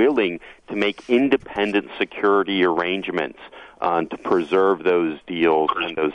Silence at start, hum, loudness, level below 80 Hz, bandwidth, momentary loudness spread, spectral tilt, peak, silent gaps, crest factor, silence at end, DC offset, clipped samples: 0 s; none; -21 LUFS; -58 dBFS; 8.8 kHz; 8 LU; -6.5 dB/octave; -6 dBFS; none; 16 dB; 0 s; under 0.1%; under 0.1%